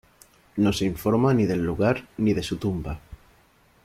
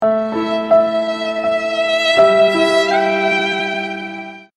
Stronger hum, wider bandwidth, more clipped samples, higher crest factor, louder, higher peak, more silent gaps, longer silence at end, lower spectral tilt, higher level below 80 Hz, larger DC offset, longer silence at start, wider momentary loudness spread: neither; first, 16 kHz vs 11 kHz; neither; about the same, 16 dB vs 14 dB; second, -24 LUFS vs -15 LUFS; second, -10 dBFS vs 0 dBFS; neither; first, 0.7 s vs 0.15 s; first, -6.5 dB/octave vs -4 dB/octave; first, -46 dBFS vs -58 dBFS; neither; first, 0.55 s vs 0 s; about the same, 12 LU vs 10 LU